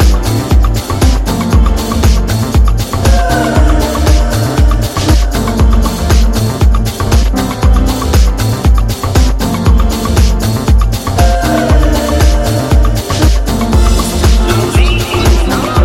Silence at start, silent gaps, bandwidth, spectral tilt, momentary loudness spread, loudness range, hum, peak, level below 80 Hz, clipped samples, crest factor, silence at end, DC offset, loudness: 0 s; none; 16.5 kHz; -5.5 dB/octave; 3 LU; 1 LU; none; 0 dBFS; -10 dBFS; 0.4%; 8 dB; 0 s; under 0.1%; -11 LUFS